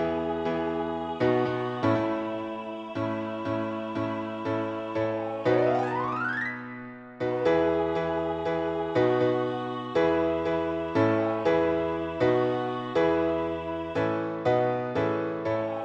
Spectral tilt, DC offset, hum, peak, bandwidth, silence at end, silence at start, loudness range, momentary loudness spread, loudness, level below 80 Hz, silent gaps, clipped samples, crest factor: -8 dB/octave; under 0.1%; none; -12 dBFS; 7.8 kHz; 0 s; 0 s; 4 LU; 7 LU; -28 LUFS; -56 dBFS; none; under 0.1%; 16 dB